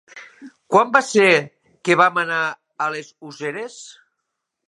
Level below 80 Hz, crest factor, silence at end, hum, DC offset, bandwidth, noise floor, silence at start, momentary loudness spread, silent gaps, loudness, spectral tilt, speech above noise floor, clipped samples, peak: -72 dBFS; 20 dB; 0.75 s; none; under 0.1%; 11.5 kHz; -78 dBFS; 0.15 s; 22 LU; none; -18 LUFS; -4 dB/octave; 60 dB; under 0.1%; 0 dBFS